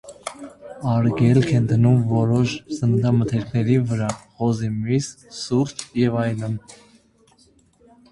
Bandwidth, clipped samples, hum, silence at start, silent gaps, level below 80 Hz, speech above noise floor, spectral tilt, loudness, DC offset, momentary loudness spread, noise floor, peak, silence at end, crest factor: 11.5 kHz; under 0.1%; none; 0.05 s; none; -50 dBFS; 37 dB; -7 dB/octave; -21 LUFS; under 0.1%; 15 LU; -57 dBFS; -4 dBFS; 1.4 s; 16 dB